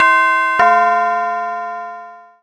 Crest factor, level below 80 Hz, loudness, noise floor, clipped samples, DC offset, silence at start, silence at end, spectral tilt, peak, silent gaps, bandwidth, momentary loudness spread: 14 dB; -62 dBFS; -14 LUFS; -35 dBFS; under 0.1%; under 0.1%; 0 s; 0.2 s; -2.5 dB/octave; 0 dBFS; none; 10 kHz; 17 LU